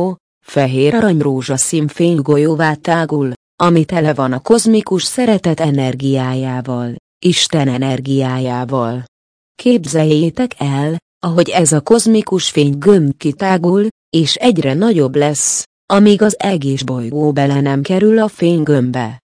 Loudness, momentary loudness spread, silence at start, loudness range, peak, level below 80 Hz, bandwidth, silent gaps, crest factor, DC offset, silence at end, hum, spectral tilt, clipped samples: -14 LUFS; 8 LU; 0 s; 3 LU; 0 dBFS; -52 dBFS; 10.5 kHz; 0.20-0.41 s, 3.36-3.58 s, 6.99-7.21 s, 9.08-9.55 s, 11.02-11.21 s, 13.91-14.12 s, 15.66-15.88 s; 14 dB; under 0.1%; 0.2 s; none; -5 dB/octave; under 0.1%